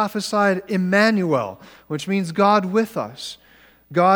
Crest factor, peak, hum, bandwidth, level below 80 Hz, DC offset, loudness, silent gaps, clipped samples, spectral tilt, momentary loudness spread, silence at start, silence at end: 18 dB; -2 dBFS; none; 18 kHz; -64 dBFS; under 0.1%; -20 LUFS; none; under 0.1%; -5.5 dB/octave; 14 LU; 0 s; 0 s